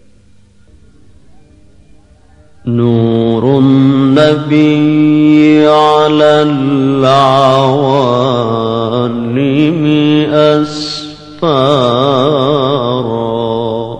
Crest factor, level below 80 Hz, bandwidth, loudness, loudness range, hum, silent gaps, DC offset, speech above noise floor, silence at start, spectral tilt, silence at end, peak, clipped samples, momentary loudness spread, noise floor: 10 dB; -44 dBFS; 9 kHz; -10 LUFS; 5 LU; none; none; 0.6%; 36 dB; 2.65 s; -7 dB/octave; 0 s; 0 dBFS; 0.3%; 8 LU; -45 dBFS